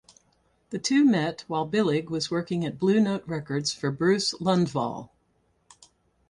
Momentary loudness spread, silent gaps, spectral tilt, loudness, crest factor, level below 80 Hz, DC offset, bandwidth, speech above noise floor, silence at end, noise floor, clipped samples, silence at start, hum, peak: 9 LU; none; -5 dB/octave; -26 LUFS; 18 dB; -64 dBFS; under 0.1%; 11.5 kHz; 44 dB; 1.25 s; -69 dBFS; under 0.1%; 0.7 s; none; -10 dBFS